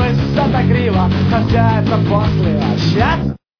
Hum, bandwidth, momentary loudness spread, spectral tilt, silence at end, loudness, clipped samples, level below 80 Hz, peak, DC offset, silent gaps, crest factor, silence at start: none; 5.4 kHz; 2 LU; -8 dB/octave; 0.25 s; -14 LUFS; under 0.1%; -28 dBFS; 0 dBFS; under 0.1%; none; 12 dB; 0 s